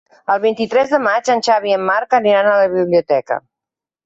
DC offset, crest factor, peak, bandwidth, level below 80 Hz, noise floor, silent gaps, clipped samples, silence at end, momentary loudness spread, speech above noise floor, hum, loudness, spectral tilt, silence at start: under 0.1%; 12 dB; -2 dBFS; 8 kHz; -62 dBFS; -87 dBFS; none; under 0.1%; 0.65 s; 6 LU; 72 dB; none; -15 LUFS; -4.5 dB/octave; 0.3 s